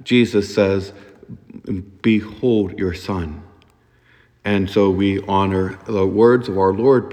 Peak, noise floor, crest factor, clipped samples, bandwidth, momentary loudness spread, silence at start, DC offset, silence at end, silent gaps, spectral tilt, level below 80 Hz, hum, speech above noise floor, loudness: -2 dBFS; -55 dBFS; 18 dB; under 0.1%; 12.5 kHz; 14 LU; 0 s; under 0.1%; 0 s; none; -7 dB/octave; -50 dBFS; none; 37 dB; -18 LUFS